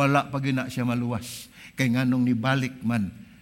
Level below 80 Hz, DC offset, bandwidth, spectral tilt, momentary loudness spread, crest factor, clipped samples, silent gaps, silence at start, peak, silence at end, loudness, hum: -60 dBFS; under 0.1%; 16.5 kHz; -6.5 dB/octave; 11 LU; 16 dB; under 0.1%; none; 0 s; -8 dBFS; 0.15 s; -26 LUFS; none